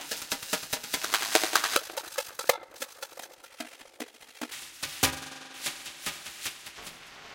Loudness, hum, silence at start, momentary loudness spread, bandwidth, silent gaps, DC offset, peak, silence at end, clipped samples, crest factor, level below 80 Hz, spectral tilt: -30 LUFS; none; 0 s; 19 LU; 17 kHz; none; under 0.1%; 0 dBFS; 0 s; under 0.1%; 34 dB; -62 dBFS; -0.5 dB/octave